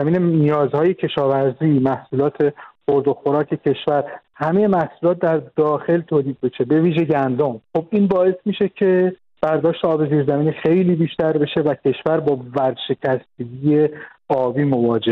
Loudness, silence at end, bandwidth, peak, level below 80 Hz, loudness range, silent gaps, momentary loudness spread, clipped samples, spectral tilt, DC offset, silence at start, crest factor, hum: -19 LUFS; 0 s; 5 kHz; -6 dBFS; -58 dBFS; 2 LU; none; 6 LU; under 0.1%; -10 dB/octave; under 0.1%; 0 s; 12 dB; none